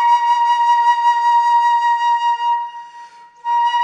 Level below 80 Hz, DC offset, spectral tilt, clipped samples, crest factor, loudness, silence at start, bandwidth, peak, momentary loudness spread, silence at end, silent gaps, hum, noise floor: -80 dBFS; under 0.1%; 3.5 dB/octave; under 0.1%; 10 dB; -15 LUFS; 0 s; 9.4 kHz; -6 dBFS; 9 LU; 0 s; none; none; -39 dBFS